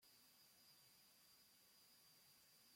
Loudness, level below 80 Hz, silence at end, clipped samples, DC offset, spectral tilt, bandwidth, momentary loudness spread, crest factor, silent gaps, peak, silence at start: -69 LUFS; under -90 dBFS; 0 s; under 0.1%; under 0.1%; -0.5 dB/octave; 16.5 kHz; 1 LU; 14 dB; none; -58 dBFS; 0 s